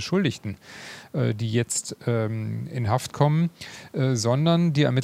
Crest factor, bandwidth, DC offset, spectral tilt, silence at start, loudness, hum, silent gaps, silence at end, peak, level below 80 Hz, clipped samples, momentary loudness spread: 20 dB; 15 kHz; under 0.1%; -5.5 dB/octave; 0 s; -25 LUFS; none; none; 0 s; -4 dBFS; -62 dBFS; under 0.1%; 15 LU